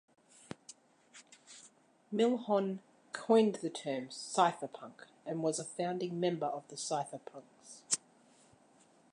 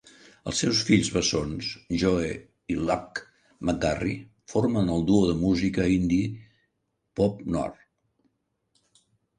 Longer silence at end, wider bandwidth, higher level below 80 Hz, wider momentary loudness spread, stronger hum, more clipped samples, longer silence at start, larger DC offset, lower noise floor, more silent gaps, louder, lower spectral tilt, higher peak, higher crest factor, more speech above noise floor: second, 1.15 s vs 1.65 s; about the same, 11 kHz vs 11 kHz; second, -86 dBFS vs -46 dBFS; first, 24 LU vs 13 LU; neither; neither; first, 0.7 s vs 0.45 s; neither; second, -66 dBFS vs -77 dBFS; neither; second, -35 LUFS vs -26 LUFS; about the same, -4 dB/octave vs -5 dB/octave; second, -14 dBFS vs -8 dBFS; about the same, 22 dB vs 20 dB; second, 31 dB vs 52 dB